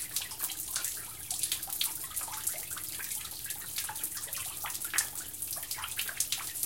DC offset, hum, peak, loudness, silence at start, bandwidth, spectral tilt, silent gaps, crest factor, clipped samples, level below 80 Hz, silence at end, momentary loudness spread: 0.1%; none; -8 dBFS; -34 LUFS; 0 s; 17 kHz; 1 dB/octave; none; 28 dB; under 0.1%; -64 dBFS; 0 s; 5 LU